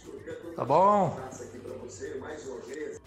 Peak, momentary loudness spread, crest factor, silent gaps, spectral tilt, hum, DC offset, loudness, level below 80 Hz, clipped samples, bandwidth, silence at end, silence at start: -12 dBFS; 19 LU; 18 dB; none; -6.5 dB/octave; none; under 0.1%; -28 LUFS; -62 dBFS; under 0.1%; 13.5 kHz; 0.05 s; 0 s